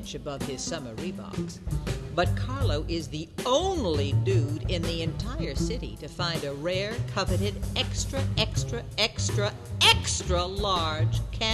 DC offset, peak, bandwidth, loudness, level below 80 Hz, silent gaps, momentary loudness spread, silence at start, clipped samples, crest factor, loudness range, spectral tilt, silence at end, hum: under 0.1%; -8 dBFS; 13 kHz; -28 LUFS; -38 dBFS; none; 9 LU; 0 s; under 0.1%; 18 dB; 5 LU; -4.5 dB/octave; 0 s; none